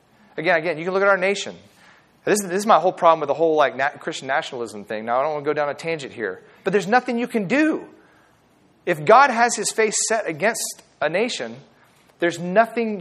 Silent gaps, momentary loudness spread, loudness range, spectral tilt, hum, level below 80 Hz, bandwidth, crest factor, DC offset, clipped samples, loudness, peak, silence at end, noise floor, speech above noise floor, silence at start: none; 13 LU; 4 LU; -3.5 dB/octave; none; -74 dBFS; 14.5 kHz; 20 dB; under 0.1%; under 0.1%; -20 LUFS; 0 dBFS; 0 s; -57 dBFS; 37 dB; 0.35 s